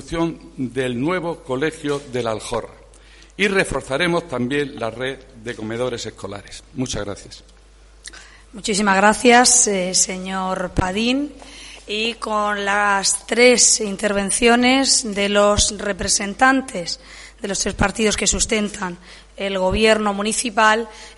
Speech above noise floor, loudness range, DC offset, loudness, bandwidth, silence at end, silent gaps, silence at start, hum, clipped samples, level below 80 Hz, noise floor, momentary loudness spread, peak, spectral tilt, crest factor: 28 dB; 10 LU; under 0.1%; -18 LUFS; 11.5 kHz; 0.05 s; none; 0 s; none; under 0.1%; -40 dBFS; -47 dBFS; 16 LU; 0 dBFS; -2.5 dB/octave; 20 dB